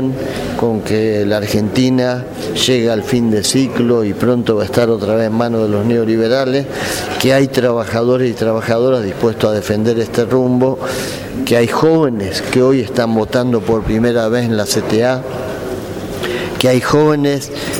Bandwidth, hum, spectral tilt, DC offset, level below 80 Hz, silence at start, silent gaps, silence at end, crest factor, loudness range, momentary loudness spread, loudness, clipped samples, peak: 19 kHz; none; -5.5 dB/octave; under 0.1%; -40 dBFS; 0 s; none; 0 s; 14 dB; 1 LU; 8 LU; -15 LUFS; under 0.1%; 0 dBFS